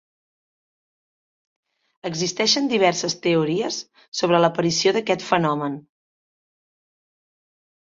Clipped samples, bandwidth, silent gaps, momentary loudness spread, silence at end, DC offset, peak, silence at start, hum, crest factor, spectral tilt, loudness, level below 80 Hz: under 0.1%; 7.8 kHz; 4.08-4.12 s; 12 LU; 2.15 s; under 0.1%; -2 dBFS; 2.05 s; none; 22 dB; -4 dB/octave; -21 LUFS; -66 dBFS